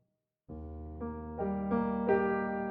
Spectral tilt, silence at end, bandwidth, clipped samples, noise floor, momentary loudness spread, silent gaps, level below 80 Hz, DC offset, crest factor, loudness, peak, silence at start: -8 dB/octave; 0 s; 4.3 kHz; under 0.1%; -65 dBFS; 16 LU; none; -54 dBFS; under 0.1%; 18 dB; -33 LUFS; -16 dBFS; 0.5 s